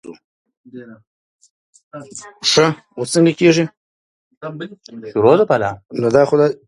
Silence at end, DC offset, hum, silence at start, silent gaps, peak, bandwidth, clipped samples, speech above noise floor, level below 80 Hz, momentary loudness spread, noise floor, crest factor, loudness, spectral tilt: 0.1 s; under 0.1%; none; 0.1 s; 0.24-0.45 s, 0.57-0.64 s, 1.07-1.39 s, 1.50-1.73 s, 1.83-1.91 s, 3.77-4.31 s, 4.37-4.41 s; 0 dBFS; 11.5 kHz; under 0.1%; over 74 dB; -58 dBFS; 23 LU; under -90 dBFS; 18 dB; -15 LUFS; -5 dB/octave